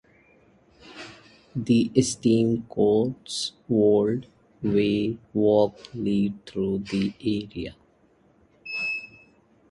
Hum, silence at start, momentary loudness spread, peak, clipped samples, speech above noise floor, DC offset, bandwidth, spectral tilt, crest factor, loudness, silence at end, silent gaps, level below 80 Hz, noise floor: none; 0.85 s; 16 LU; -6 dBFS; under 0.1%; 37 dB; under 0.1%; 11.5 kHz; -6 dB/octave; 20 dB; -25 LUFS; 0.65 s; none; -56 dBFS; -61 dBFS